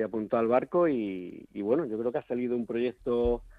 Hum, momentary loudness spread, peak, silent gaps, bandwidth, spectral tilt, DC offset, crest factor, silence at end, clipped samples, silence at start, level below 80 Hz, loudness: none; 9 LU; -10 dBFS; none; 4.8 kHz; -9 dB/octave; under 0.1%; 18 dB; 0.05 s; under 0.1%; 0 s; -50 dBFS; -29 LUFS